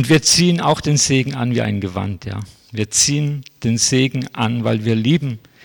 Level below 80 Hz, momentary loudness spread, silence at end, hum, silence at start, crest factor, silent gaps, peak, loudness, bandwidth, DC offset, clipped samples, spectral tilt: -48 dBFS; 13 LU; 0.25 s; none; 0 s; 14 dB; none; -4 dBFS; -17 LUFS; 19 kHz; under 0.1%; under 0.1%; -4 dB/octave